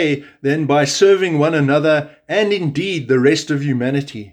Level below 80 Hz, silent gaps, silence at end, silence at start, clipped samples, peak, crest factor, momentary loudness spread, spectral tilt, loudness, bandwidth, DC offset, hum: -62 dBFS; none; 0.05 s; 0 s; under 0.1%; -2 dBFS; 14 dB; 8 LU; -5.5 dB/octave; -16 LUFS; 12.5 kHz; under 0.1%; none